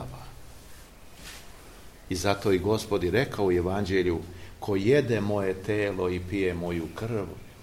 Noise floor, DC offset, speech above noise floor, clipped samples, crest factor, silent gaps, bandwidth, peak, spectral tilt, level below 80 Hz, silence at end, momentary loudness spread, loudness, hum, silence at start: -48 dBFS; 0.1%; 21 dB; under 0.1%; 20 dB; none; 16.5 kHz; -8 dBFS; -6 dB/octave; -50 dBFS; 0 s; 20 LU; -27 LUFS; none; 0 s